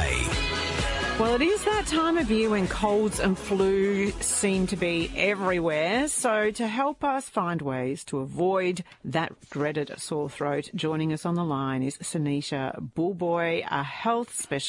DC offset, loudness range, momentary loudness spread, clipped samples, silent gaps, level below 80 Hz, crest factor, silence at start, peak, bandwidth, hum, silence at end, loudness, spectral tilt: under 0.1%; 5 LU; 7 LU; under 0.1%; none; -42 dBFS; 16 dB; 0 s; -10 dBFS; 11.5 kHz; none; 0 s; -26 LUFS; -4.5 dB/octave